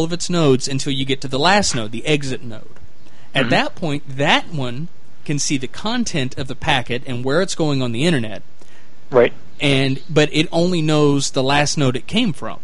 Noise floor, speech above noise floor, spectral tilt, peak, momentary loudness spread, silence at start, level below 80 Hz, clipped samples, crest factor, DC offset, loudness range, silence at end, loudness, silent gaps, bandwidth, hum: -49 dBFS; 30 dB; -4.5 dB/octave; -2 dBFS; 10 LU; 0 s; -44 dBFS; under 0.1%; 18 dB; 8%; 4 LU; 0.05 s; -18 LUFS; none; 11.5 kHz; none